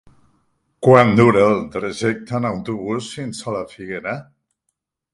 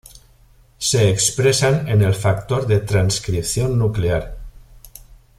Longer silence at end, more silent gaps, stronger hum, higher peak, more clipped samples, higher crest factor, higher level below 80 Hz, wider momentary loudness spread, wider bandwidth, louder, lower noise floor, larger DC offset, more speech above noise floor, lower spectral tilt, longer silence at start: first, 0.9 s vs 0.25 s; neither; neither; first, 0 dBFS vs -4 dBFS; neither; about the same, 18 dB vs 16 dB; second, -52 dBFS vs -38 dBFS; first, 16 LU vs 6 LU; second, 11.5 kHz vs 15 kHz; about the same, -18 LUFS vs -18 LUFS; first, -75 dBFS vs -51 dBFS; neither; first, 58 dB vs 34 dB; first, -6.5 dB/octave vs -4.5 dB/octave; first, 0.8 s vs 0.15 s